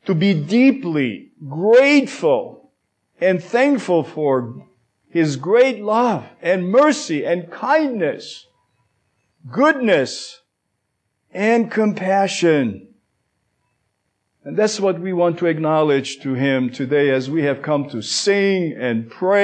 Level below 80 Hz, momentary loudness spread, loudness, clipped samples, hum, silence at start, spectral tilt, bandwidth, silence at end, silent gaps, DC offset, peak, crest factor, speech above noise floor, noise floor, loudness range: -72 dBFS; 10 LU; -18 LUFS; under 0.1%; none; 0.05 s; -5.5 dB/octave; 9.6 kHz; 0 s; none; under 0.1%; -4 dBFS; 16 dB; 56 dB; -73 dBFS; 4 LU